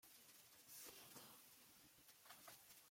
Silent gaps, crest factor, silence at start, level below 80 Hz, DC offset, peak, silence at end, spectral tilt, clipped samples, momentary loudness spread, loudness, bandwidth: none; 18 dB; 0 s; under -90 dBFS; under 0.1%; -46 dBFS; 0 s; -1 dB/octave; under 0.1%; 8 LU; -62 LUFS; 16.5 kHz